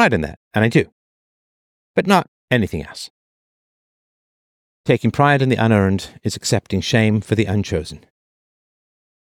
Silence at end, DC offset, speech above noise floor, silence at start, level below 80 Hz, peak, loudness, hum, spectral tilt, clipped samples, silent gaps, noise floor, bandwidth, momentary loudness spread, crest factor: 1.25 s; under 0.1%; over 73 dB; 0 s; -46 dBFS; -2 dBFS; -18 LUFS; none; -6 dB/octave; under 0.1%; 0.37-0.51 s, 0.92-1.94 s, 2.28-2.48 s, 3.10-4.84 s; under -90 dBFS; 15.5 kHz; 13 LU; 18 dB